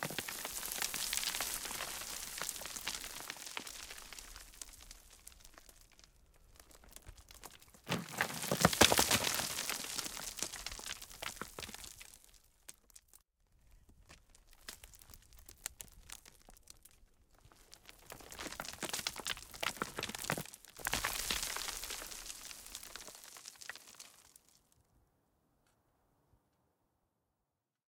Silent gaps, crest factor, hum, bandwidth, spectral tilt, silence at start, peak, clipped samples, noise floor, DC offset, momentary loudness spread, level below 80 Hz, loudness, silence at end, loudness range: none; 32 dB; none; 18 kHz; -1.5 dB/octave; 0 s; -12 dBFS; under 0.1%; -88 dBFS; under 0.1%; 22 LU; -62 dBFS; -38 LUFS; 3.7 s; 22 LU